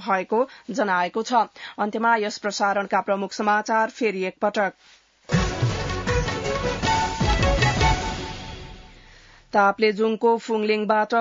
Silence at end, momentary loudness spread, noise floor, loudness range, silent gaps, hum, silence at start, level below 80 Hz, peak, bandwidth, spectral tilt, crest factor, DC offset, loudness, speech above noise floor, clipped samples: 0 s; 7 LU; -50 dBFS; 2 LU; none; none; 0 s; -36 dBFS; -6 dBFS; 7.8 kHz; -5 dB/octave; 18 dB; under 0.1%; -23 LUFS; 27 dB; under 0.1%